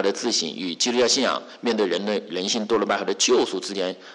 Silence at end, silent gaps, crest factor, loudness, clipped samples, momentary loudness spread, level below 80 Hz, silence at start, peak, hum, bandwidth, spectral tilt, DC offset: 0 s; none; 12 dB; -22 LUFS; under 0.1%; 8 LU; -68 dBFS; 0 s; -10 dBFS; none; 11 kHz; -2 dB/octave; under 0.1%